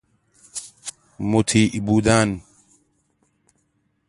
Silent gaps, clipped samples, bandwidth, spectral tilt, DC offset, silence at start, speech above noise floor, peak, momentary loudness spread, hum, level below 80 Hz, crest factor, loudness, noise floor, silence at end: none; under 0.1%; 11.5 kHz; -5 dB/octave; under 0.1%; 0.55 s; 50 dB; -2 dBFS; 18 LU; none; -46 dBFS; 22 dB; -19 LUFS; -68 dBFS; 1.7 s